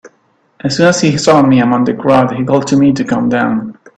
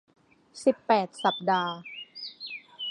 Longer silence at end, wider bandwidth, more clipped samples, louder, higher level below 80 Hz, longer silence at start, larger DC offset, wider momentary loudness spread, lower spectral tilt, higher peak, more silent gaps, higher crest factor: first, 0.25 s vs 0 s; second, 9.2 kHz vs 11 kHz; neither; first, -11 LUFS vs -28 LUFS; first, -48 dBFS vs -80 dBFS; second, 0.05 s vs 0.55 s; neither; second, 7 LU vs 15 LU; about the same, -5.5 dB/octave vs -4.5 dB/octave; first, 0 dBFS vs -8 dBFS; neither; second, 12 dB vs 22 dB